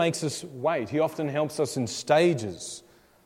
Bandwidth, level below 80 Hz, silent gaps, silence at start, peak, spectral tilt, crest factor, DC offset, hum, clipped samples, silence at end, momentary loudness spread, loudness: 16 kHz; -68 dBFS; none; 0 s; -8 dBFS; -5 dB/octave; 20 dB; under 0.1%; none; under 0.1%; 0.45 s; 14 LU; -27 LUFS